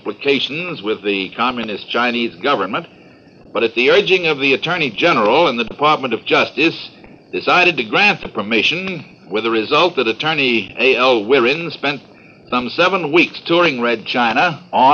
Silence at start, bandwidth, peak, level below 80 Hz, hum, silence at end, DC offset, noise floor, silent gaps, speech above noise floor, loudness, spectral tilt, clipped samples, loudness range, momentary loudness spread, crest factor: 0.05 s; 7 kHz; 0 dBFS; -56 dBFS; none; 0 s; under 0.1%; -44 dBFS; none; 28 dB; -15 LUFS; -5 dB/octave; under 0.1%; 3 LU; 9 LU; 16 dB